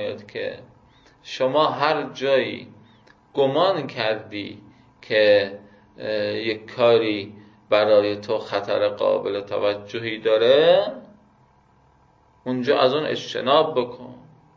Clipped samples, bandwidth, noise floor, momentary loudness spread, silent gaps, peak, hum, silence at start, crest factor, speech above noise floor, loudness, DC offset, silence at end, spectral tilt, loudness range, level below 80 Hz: under 0.1%; 7.2 kHz; -57 dBFS; 16 LU; none; -2 dBFS; none; 0 s; 20 dB; 36 dB; -21 LUFS; under 0.1%; 0.4 s; -5.5 dB/octave; 3 LU; -64 dBFS